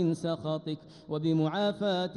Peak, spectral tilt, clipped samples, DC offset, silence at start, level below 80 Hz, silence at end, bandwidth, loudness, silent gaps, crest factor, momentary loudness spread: -16 dBFS; -7 dB/octave; under 0.1%; under 0.1%; 0 s; -70 dBFS; 0 s; 11 kHz; -31 LUFS; none; 14 dB; 10 LU